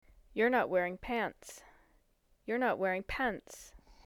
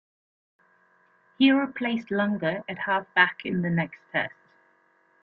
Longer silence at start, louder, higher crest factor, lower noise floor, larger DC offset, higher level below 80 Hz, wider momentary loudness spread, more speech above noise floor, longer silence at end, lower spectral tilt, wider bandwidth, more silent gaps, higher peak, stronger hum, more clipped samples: second, 0.35 s vs 1.4 s; second, -34 LUFS vs -25 LUFS; about the same, 18 dB vs 22 dB; first, -71 dBFS vs -64 dBFS; neither; first, -58 dBFS vs -70 dBFS; first, 21 LU vs 8 LU; about the same, 37 dB vs 39 dB; second, 0.15 s vs 0.95 s; second, -5 dB/octave vs -8 dB/octave; first, 19.5 kHz vs 4.9 kHz; neither; second, -18 dBFS vs -6 dBFS; neither; neither